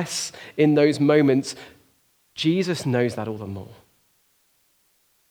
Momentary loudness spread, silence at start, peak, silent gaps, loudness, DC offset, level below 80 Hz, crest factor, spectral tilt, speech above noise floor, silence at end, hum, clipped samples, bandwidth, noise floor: 18 LU; 0 s; -6 dBFS; none; -22 LUFS; under 0.1%; -70 dBFS; 18 dB; -5.5 dB/octave; 43 dB; 1.55 s; none; under 0.1%; 18.5 kHz; -64 dBFS